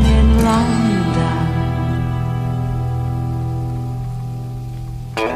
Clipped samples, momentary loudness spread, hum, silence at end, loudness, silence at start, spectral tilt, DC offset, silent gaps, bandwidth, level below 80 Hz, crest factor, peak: under 0.1%; 13 LU; none; 0 s; -19 LUFS; 0 s; -7 dB/octave; 0.3%; none; 14 kHz; -22 dBFS; 14 dB; -4 dBFS